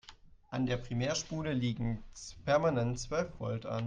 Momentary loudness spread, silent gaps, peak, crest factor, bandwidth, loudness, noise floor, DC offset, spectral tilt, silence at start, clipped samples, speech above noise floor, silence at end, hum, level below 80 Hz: 12 LU; none; -16 dBFS; 18 dB; 9.6 kHz; -34 LUFS; -57 dBFS; under 0.1%; -5.5 dB/octave; 0.05 s; under 0.1%; 23 dB; 0 s; none; -52 dBFS